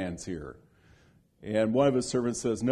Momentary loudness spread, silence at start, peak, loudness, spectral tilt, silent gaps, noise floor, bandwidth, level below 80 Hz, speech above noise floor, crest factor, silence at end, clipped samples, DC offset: 17 LU; 0 s; -12 dBFS; -29 LUFS; -5.5 dB/octave; none; -62 dBFS; 12 kHz; -58 dBFS; 34 dB; 18 dB; 0 s; under 0.1%; under 0.1%